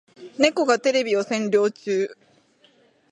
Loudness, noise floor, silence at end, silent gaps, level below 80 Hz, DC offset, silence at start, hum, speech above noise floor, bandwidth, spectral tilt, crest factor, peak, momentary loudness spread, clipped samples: -22 LUFS; -59 dBFS; 1 s; none; -72 dBFS; under 0.1%; 0.2 s; none; 37 dB; 10.5 kHz; -3.5 dB/octave; 20 dB; -4 dBFS; 6 LU; under 0.1%